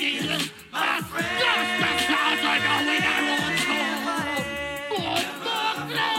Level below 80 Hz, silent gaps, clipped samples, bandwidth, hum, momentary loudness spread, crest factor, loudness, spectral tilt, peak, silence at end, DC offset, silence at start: -58 dBFS; none; under 0.1%; 16.5 kHz; none; 7 LU; 16 dB; -23 LUFS; -2.5 dB/octave; -8 dBFS; 0 s; under 0.1%; 0 s